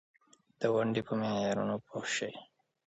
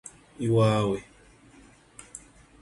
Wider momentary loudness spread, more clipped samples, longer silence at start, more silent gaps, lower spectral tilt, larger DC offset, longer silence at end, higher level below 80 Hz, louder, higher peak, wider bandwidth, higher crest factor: second, 7 LU vs 24 LU; neither; first, 0.6 s vs 0.4 s; neither; second, -5 dB/octave vs -6.5 dB/octave; neither; about the same, 0.4 s vs 0.45 s; second, -72 dBFS vs -56 dBFS; second, -34 LUFS vs -25 LUFS; second, -14 dBFS vs -10 dBFS; second, 8.4 kHz vs 11.5 kHz; about the same, 20 dB vs 18 dB